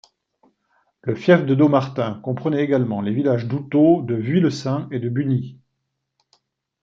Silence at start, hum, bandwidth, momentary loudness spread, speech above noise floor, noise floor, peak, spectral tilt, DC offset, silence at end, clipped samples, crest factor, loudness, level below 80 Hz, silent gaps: 1.05 s; none; 7.6 kHz; 9 LU; 57 dB; -76 dBFS; -2 dBFS; -8 dB/octave; under 0.1%; 1.3 s; under 0.1%; 18 dB; -20 LUFS; -64 dBFS; none